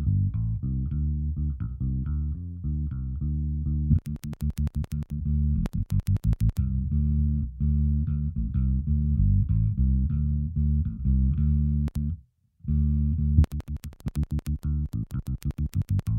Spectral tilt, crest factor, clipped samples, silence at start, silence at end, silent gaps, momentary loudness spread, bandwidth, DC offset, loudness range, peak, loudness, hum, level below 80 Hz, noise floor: -9.5 dB/octave; 20 dB; under 0.1%; 0 s; 0 s; none; 8 LU; 4.4 kHz; under 0.1%; 4 LU; -6 dBFS; -27 LUFS; none; -30 dBFS; -51 dBFS